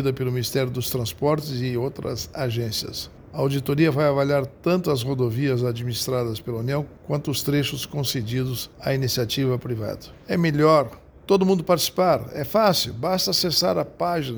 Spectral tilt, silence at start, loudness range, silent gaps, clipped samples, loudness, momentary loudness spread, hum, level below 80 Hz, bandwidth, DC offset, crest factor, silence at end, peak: -5 dB/octave; 0 s; 5 LU; none; under 0.1%; -23 LUFS; 9 LU; none; -50 dBFS; over 20 kHz; under 0.1%; 18 dB; 0 s; -4 dBFS